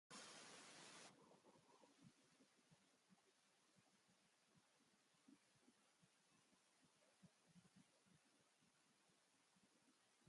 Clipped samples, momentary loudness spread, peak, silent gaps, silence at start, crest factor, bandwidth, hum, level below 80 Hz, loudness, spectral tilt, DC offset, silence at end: under 0.1%; 5 LU; -46 dBFS; none; 0.1 s; 24 dB; 11.5 kHz; none; under -90 dBFS; -62 LUFS; -2 dB/octave; under 0.1%; 0 s